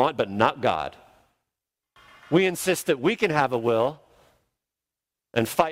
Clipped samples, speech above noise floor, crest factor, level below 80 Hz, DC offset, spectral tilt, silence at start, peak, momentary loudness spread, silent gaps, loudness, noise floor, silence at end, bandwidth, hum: under 0.1%; 65 dB; 24 dB; -62 dBFS; under 0.1%; -5 dB/octave; 0 s; -2 dBFS; 6 LU; none; -24 LUFS; -88 dBFS; 0 s; 16 kHz; none